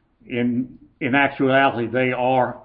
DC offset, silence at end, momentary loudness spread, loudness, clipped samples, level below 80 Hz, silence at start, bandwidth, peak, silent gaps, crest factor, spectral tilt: under 0.1%; 0.05 s; 11 LU; -20 LUFS; under 0.1%; -56 dBFS; 0.3 s; 4.7 kHz; -4 dBFS; none; 16 dB; -11 dB/octave